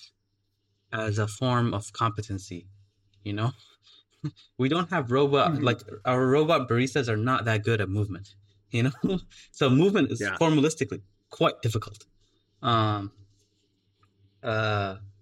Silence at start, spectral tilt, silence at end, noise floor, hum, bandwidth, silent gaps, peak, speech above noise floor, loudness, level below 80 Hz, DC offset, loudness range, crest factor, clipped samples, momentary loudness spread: 0 s; -6 dB/octave; 0.1 s; -75 dBFS; none; 12 kHz; none; -10 dBFS; 49 dB; -26 LUFS; -60 dBFS; under 0.1%; 7 LU; 18 dB; under 0.1%; 15 LU